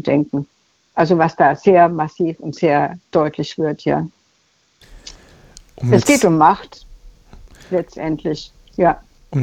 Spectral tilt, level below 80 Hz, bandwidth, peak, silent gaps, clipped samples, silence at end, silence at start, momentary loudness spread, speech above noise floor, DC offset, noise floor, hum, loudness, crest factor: -6 dB/octave; -46 dBFS; 18.5 kHz; -2 dBFS; none; under 0.1%; 0 s; 0.05 s; 16 LU; 44 dB; under 0.1%; -60 dBFS; none; -17 LUFS; 16 dB